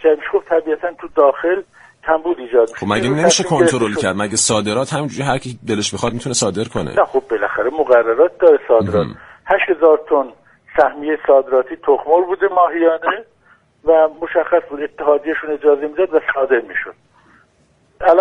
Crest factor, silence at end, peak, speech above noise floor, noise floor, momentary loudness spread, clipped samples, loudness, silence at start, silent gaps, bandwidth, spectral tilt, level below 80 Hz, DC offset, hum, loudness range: 16 dB; 0 s; 0 dBFS; 41 dB; -56 dBFS; 9 LU; under 0.1%; -16 LUFS; 0.05 s; none; 11 kHz; -4 dB/octave; -50 dBFS; under 0.1%; none; 3 LU